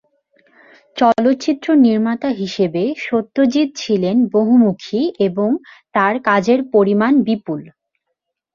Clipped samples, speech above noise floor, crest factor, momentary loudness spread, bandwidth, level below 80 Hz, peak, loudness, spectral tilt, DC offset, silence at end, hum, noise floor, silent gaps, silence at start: under 0.1%; 61 dB; 16 dB; 7 LU; 7.2 kHz; -62 dBFS; 0 dBFS; -16 LUFS; -6.5 dB/octave; under 0.1%; 0.85 s; none; -76 dBFS; none; 0.95 s